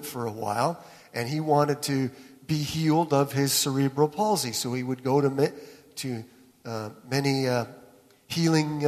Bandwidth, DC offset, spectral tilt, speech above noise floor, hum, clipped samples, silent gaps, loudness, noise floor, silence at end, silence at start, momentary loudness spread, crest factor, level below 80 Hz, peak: 14 kHz; under 0.1%; -5 dB/octave; 29 dB; none; under 0.1%; none; -26 LUFS; -55 dBFS; 0 s; 0 s; 14 LU; 18 dB; -64 dBFS; -8 dBFS